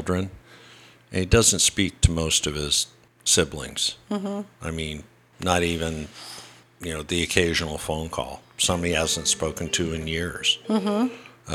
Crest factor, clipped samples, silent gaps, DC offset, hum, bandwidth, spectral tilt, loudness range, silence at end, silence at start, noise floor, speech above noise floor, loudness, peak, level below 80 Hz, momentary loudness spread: 24 dB; under 0.1%; none; under 0.1%; none; 17 kHz; -3 dB/octave; 7 LU; 0 s; 0 s; -50 dBFS; 26 dB; -23 LUFS; -2 dBFS; -38 dBFS; 13 LU